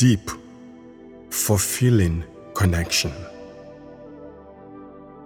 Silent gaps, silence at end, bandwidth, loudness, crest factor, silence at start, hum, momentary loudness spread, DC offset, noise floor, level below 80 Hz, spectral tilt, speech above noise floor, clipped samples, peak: none; 0 s; 19.5 kHz; -22 LUFS; 18 dB; 0 s; none; 25 LU; under 0.1%; -43 dBFS; -40 dBFS; -4.5 dB/octave; 24 dB; under 0.1%; -6 dBFS